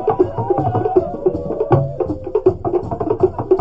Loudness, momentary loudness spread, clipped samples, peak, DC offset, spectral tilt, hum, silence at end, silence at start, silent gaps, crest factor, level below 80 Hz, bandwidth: -18 LUFS; 5 LU; under 0.1%; 0 dBFS; under 0.1%; -11 dB/octave; none; 0 s; 0 s; none; 16 dB; -36 dBFS; 5 kHz